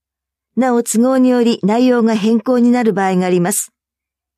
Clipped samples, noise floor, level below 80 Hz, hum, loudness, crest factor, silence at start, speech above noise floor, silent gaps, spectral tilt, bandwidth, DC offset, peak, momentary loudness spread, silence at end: under 0.1%; -84 dBFS; -68 dBFS; none; -14 LUFS; 12 dB; 0.55 s; 72 dB; none; -5.5 dB/octave; 15 kHz; under 0.1%; -2 dBFS; 6 LU; 0.7 s